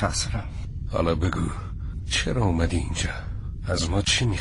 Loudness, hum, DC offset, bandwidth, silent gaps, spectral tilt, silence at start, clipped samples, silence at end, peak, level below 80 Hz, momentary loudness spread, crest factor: -26 LUFS; none; under 0.1%; 11.5 kHz; none; -4.5 dB/octave; 0 s; under 0.1%; 0 s; -10 dBFS; -32 dBFS; 12 LU; 16 dB